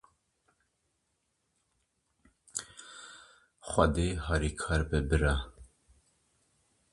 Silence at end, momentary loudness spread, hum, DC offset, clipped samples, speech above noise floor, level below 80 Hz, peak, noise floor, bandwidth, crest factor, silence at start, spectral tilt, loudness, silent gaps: 1.25 s; 20 LU; none; under 0.1%; under 0.1%; 50 dB; -40 dBFS; -10 dBFS; -79 dBFS; 11.5 kHz; 24 dB; 2.55 s; -5.5 dB/octave; -31 LUFS; none